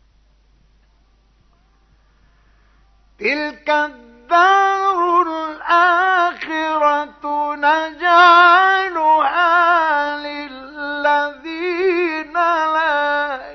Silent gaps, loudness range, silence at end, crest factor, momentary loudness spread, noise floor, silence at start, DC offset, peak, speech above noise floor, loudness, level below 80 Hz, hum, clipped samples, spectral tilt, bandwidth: none; 11 LU; 0 s; 16 dB; 13 LU; -55 dBFS; 3.2 s; under 0.1%; -2 dBFS; 41 dB; -15 LUFS; -56 dBFS; none; under 0.1%; -2.5 dB/octave; 6.4 kHz